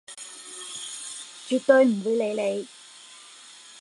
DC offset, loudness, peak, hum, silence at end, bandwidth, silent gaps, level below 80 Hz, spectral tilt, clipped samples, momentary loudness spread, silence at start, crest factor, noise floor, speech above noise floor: under 0.1%; -25 LUFS; -4 dBFS; none; 0 s; 11.5 kHz; none; -84 dBFS; -3.5 dB/octave; under 0.1%; 26 LU; 0.1 s; 22 dB; -48 dBFS; 26 dB